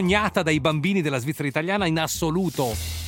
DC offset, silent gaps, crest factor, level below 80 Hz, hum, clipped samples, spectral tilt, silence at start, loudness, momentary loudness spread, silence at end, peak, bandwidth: under 0.1%; none; 18 dB; -44 dBFS; none; under 0.1%; -5 dB/octave; 0 s; -23 LUFS; 5 LU; 0 s; -6 dBFS; 17 kHz